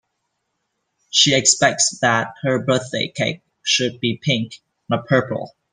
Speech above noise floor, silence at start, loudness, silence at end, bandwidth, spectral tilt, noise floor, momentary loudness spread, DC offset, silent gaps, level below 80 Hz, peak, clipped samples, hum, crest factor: 55 dB; 1.15 s; -18 LUFS; 0.25 s; 10.5 kHz; -2.5 dB/octave; -74 dBFS; 11 LU; under 0.1%; none; -62 dBFS; 0 dBFS; under 0.1%; none; 20 dB